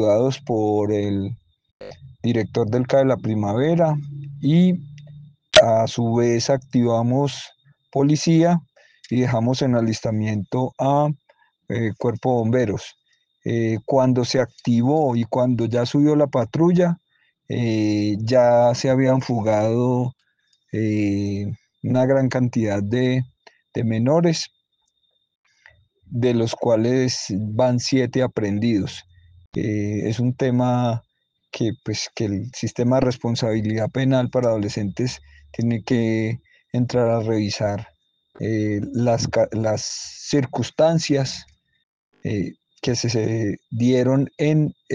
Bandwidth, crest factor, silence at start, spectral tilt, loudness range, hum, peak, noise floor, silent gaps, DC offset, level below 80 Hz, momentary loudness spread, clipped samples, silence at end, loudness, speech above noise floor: 9.6 kHz; 20 dB; 0 s; -6.5 dB/octave; 4 LU; none; -2 dBFS; -69 dBFS; 1.71-1.80 s, 25.35-25.44 s, 29.46-29.52 s, 41.83-42.12 s; under 0.1%; -56 dBFS; 11 LU; under 0.1%; 0 s; -21 LUFS; 50 dB